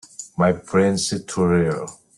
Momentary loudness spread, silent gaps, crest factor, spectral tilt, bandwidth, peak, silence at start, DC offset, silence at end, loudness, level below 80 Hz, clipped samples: 7 LU; none; 16 dB; -5.5 dB/octave; 12 kHz; -4 dBFS; 0.2 s; under 0.1%; 0.25 s; -20 LUFS; -54 dBFS; under 0.1%